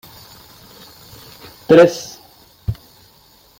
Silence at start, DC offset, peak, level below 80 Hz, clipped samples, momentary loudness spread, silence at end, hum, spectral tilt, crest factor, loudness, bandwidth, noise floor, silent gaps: 1.7 s; under 0.1%; 0 dBFS; -44 dBFS; under 0.1%; 29 LU; 0.85 s; none; -6 dB/octave; 20 dB; -14 LUFS; 17 kHz; -50 dBFS; none